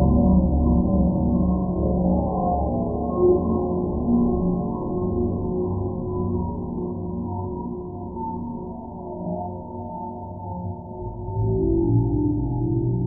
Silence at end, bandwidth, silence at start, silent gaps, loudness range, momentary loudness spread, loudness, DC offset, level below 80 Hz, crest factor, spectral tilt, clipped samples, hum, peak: 0 s; 1.2 kHz; 0 s; none; 10 LU; 13 LU; -24 LUFS; under 0.1%; -32 dBFS; 16 dB; -17 dB/octave; under 0.1%; none; -8 dBFS